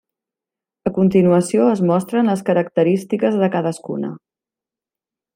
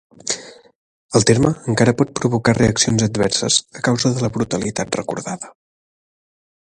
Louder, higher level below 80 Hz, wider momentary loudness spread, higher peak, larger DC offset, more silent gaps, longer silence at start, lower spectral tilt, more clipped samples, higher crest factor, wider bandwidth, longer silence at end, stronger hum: about the same, -17 LUFS vs -18 LUFS; second, -58 dBFS vs -46 dBFS; about the same, 11 LU vs 11 LU; about the same, -2 dBFS vs 0 dBFS; neither; second, none vs 0.75-1.09 s; first, 0.85 s vs 0.25 s; first, -7.5 dB/octave vs -4.5 dB/octave; neither; about the same, 16 dB vs 20 dB; first, 15.5 kHz vs 11.5 kHz; about the same, 1.2 s vs 1.2 s; neither